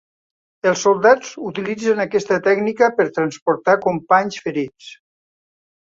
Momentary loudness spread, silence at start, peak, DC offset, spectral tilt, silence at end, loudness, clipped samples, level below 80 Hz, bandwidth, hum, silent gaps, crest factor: 10 LU; 0.65 s; -2 dBFS; under 0.1%; -4.5 dB/octave; 0.9 s; -18 LUFS; under 0.1%; -64 dBFS; 7.8 kHz; none; 3.42-3.46 s; 18 dB